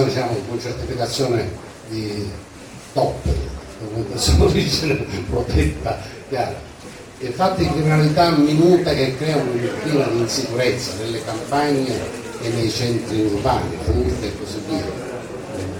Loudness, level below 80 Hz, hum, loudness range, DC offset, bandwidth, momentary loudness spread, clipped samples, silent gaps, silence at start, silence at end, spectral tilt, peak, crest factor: -20 LUFS; -34 dBFS; none; 6 LU; under 0.1%; 18 kHz; 15 LU; under 0.1%; none; 0 s; 0 s; -5.5 dB/octave; -2 dBFS; 18 dB